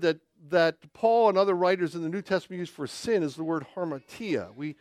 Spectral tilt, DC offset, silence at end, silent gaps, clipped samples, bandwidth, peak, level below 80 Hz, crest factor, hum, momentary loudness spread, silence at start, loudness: -5.5 dB/octave; under 0.1%; 0.05 s; none; under 0.1%; 14 kHz; -10 dBFS; -70 dBFS; 18 dB; none; 13 LU; 0 s; -27 LUFS